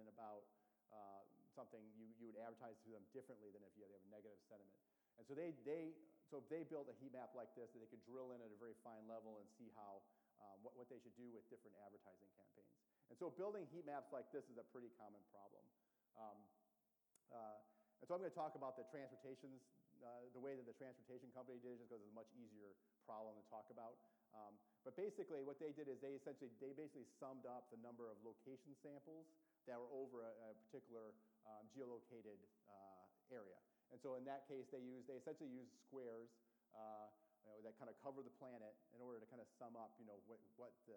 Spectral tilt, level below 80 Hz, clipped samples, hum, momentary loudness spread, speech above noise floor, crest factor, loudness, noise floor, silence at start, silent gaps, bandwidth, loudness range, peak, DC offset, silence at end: -7 dB/octave; under -90 dBFS; under 0.1%; none; 14 LU; 31 dB; 20 dB; -58 LUFS; -88 dBFS; 0 s; none; 19.5 kHz; 7 LU; -38 dBFS; under 0.1%; 0 s